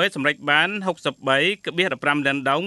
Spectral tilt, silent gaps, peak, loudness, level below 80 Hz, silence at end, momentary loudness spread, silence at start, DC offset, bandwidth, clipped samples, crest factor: -4.5 dB/octave; none; -2 dBFS; -21 LUFS; -70 dBFS; 0 s; 6 LU; 0 s; under 0.1%; 12 kHz; under 0.1%; 18 dB